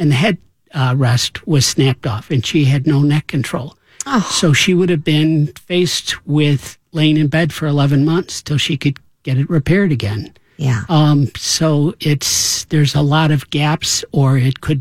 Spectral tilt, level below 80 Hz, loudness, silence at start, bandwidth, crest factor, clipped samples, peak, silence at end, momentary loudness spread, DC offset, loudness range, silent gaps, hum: -5 dB/octave; -44 dBFS; -15 LUFS; 0 s; 15.5 kHz; 14 dB; under 0.1%; 0 dBFS; 0 s; 8 LU; 0.4%; 2 LU; none; none